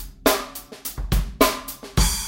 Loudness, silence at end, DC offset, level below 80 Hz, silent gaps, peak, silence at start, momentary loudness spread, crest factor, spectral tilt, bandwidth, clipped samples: -23 LUFS; 0 s; under 0.1%; -28 dBFS; none; -2 dBFS; 0 s; 12 LU; 20 dB; -3.5 dB/octave; 17 kHz; under 0.1%